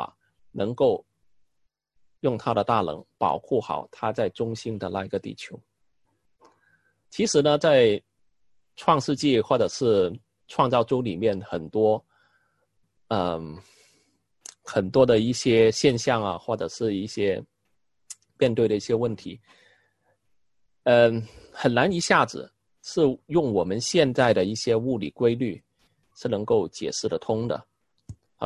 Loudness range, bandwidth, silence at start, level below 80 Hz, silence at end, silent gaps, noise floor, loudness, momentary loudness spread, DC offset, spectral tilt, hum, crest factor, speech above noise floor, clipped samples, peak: 6 LU; 11.5 kHz; 0 s; -58 dBFS; 0 s; none; -76 dBFS; -24 LUFS; 14 LU; under 0.1%; -5 dB/octave; none; 20 dB; 52 dB; under 0.1%; -4 dBFS